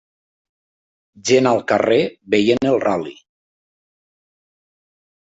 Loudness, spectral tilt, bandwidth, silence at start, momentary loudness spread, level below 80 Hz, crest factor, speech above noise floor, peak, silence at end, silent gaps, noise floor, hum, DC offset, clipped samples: -17 LUFS; -4.5 dB/octave; 8 kHz; 1.25 s; 9 LU; -58 dBFS; 18 dB; over 73 dB; -2 dBFS; 2.3 s; none; under -90 dBFS; none; under 0.1%; under 0.1%